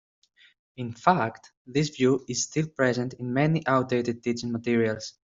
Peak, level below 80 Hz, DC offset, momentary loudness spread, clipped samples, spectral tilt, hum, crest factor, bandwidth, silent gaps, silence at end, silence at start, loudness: -4 dBFS; -64 dBFS; under 0.1%; 7 LU; under 0.1%; -5.5 dB/octave; none; 22 dB; 7.8 kHz; 1.57-1.65 s; 0.15 s; 0.8 s; -26 LUFS